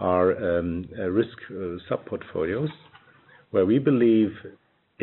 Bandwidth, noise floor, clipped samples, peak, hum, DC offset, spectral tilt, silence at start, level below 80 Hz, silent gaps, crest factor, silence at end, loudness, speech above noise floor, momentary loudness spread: 4.2 kHz; -55 dBFS; under 0.1%; -8 dBFS; none; under 0.1%; -7 dB/octave; 0 s; -56 dBFS; none; 16 dB; 0 s; -25 LUFS; 31 dB; 13 LU